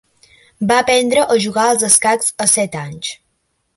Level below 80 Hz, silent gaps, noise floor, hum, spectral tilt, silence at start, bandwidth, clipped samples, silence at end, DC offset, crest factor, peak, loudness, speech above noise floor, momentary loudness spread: -56 dBFS; none; -67 dBFS; none; -2 dB/octave; 0.6 s; 16 kHz; under 0.1%; 0.6 s; under 0.1%; 16 dB; 0 dBFS; -14 LUFS; 52 dB; 14 LU